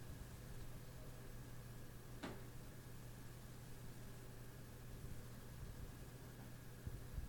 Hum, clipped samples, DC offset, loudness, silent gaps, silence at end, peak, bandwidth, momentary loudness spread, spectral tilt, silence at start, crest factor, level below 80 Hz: none; under 0.1%; under 0.1%; -56 LUFS; none; 0 s; -36 dBFS; 17.5 kHz; 4 LU; -5.5 dB/octave; 0 s; 16 dB; -58 dBFS